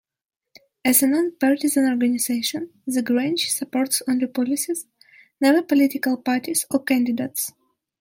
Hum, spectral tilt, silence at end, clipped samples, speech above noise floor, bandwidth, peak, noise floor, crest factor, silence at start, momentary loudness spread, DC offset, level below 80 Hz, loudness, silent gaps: none; -2.5 dB/octave; 0.5 s; under 0.1%; 66 dB; 16.5 kHz; -4 dBFS; -87 dBFS; 18 dB; 0.85 s; 9 LU; under 0.1%; -72 dBFS; -21 LUFS; none